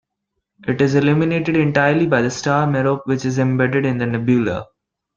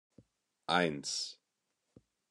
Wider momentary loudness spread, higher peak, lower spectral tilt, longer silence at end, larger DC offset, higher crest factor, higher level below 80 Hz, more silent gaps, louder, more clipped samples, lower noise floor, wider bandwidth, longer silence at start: second, 5 LU vs 12 LU; first, -2 dBFS vs -14 dBFS; first, -7 dB/octave vs -3 dB/octave; second, 0.55 s vs 1 s; neither; second, 16 dB vs 24 dB; first, -52 dBFS vs -76 dBFS; neither; first, -17 LUFS vs -34 LUFS; neither; second, -77 dBFS vs -85 dBFS; second, 7.6 kHz vs 12 kHz; about the same, 0.65 s vs 0.7 s